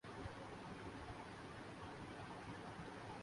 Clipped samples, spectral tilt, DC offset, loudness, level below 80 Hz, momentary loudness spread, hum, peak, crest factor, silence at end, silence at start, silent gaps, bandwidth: under 0.1%; -5.5 dB/octave; under 0.1%; -53 LUFS; -66 dBFS; 1 LU; none; -38 dBFS; 14 dB; 0 s; 0.05 s; none; 11.5 kHz